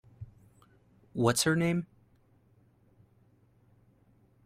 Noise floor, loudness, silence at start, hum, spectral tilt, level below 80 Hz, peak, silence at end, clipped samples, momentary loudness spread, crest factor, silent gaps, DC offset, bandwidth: -65 dBFS; -29 LUFS; 0.2 s; none; -4.5 dB/octave; -66 dBFS; -12 dBFS; 2.6 s; under 0.1%; 25 LU; 24 dB; none; under 0.1%; 16 kHz